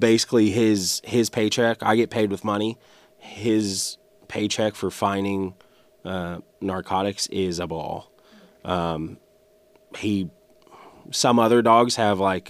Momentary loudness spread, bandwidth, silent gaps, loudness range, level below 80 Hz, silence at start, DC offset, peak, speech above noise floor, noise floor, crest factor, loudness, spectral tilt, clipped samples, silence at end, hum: 16 LU; 15.5 kHz; none; 7 LU; -58 dBFS; 0 s; under 0.1%; -6 dBFS; 36 dB; -58 dBFS; 18 dB; -23 LUFS; -4.5 dB/octave; under 0.1%; 0 s; none